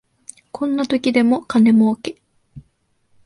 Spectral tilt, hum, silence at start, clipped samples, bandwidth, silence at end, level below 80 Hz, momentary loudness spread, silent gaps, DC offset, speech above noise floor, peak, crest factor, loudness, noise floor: -6 dB/octave; none; 0.55 s; under 0.1%; 11 kHz; 0.65 s; -58 dBFS; 14 LU; none; under 0.1%; 48 dB; -2 dBFS; 16 dB; -17 LUFS; -64 dBFS